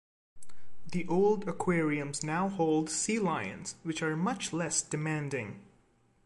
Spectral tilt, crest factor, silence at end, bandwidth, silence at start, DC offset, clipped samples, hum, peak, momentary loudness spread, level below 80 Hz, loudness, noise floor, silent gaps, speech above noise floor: -4.5 dB/octave; 16 dB; 0 s; 11.5 kHz; 0.35 s; under 0.1%; under 0.1%; none; -16 dBFS; 9 LU; -64 dBFS; -32 LUFS; -67 dBFS; none; 36 dB